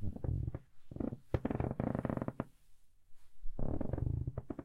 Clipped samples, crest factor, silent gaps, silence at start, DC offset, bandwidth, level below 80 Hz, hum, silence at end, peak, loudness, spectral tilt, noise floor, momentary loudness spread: under 0.1%; 18 dB; none; 0 s; under 0.1%; 4.3 kHz; -46 dBFS; none; 0 s; -20 dBFS; -40 LUFS; -10.5 dB/octave; -58 dBFS; 12 LU